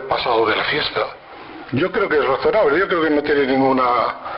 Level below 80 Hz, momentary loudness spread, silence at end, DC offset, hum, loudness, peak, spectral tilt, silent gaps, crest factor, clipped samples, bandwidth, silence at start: -50 dBFS; 10 LU; 0 s; under 0.1%; none; -18 LUFS; -8 dBFS; -8 dB/octave; none; 10 dB; under 0.1%; 5.6 kHz; 0 s